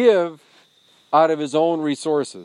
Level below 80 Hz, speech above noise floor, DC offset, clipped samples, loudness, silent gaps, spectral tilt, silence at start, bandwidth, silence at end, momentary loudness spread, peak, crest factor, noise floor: -84 dBFS; 38 dB; under 0.1%; under 0.1%; -20 LUFS; none; -5 dB/octave; 0 s; 11.5 kHz; 0 s; 6 LU; -2 dBFS; 18 dB; -56 dBFS